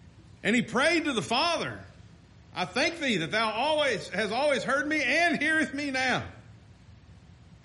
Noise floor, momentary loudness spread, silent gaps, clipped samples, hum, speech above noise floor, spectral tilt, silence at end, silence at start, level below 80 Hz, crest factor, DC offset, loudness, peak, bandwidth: -53 dBFS; 8 LU; none; under 0.1%; none; 26 dB; -3.5 dB/octave; 0.5 s; 0.05 s; -60 dBFS; 18 dB; under 0.1%; -27 LUFS; -12 dBFS; 11.5 kHz